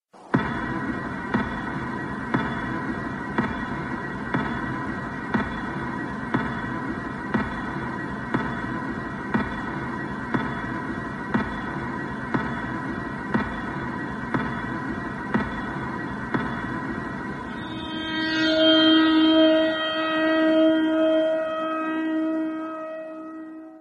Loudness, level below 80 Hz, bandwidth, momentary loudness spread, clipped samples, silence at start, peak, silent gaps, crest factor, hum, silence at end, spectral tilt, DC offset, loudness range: -25 LUFS; -46 dBFS; 9.8 kHz; 12 LU; under 0.1%; 0.15 s; -6 dBFS; none; 18 dB; none; 0 s; -6.5 dB/octave; under 0.1%; 9 LU